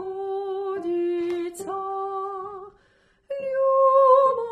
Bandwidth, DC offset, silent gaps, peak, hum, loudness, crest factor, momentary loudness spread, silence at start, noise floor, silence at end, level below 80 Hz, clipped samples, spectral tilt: 12.5 kHz; under 0.1%; none; -6 dBFS; none; -23 LUFS; 16 dB; 16 LU; 0 s; -62 dBFS; 0 s; -68 dBFS; under 0.1%; -5 dB/octave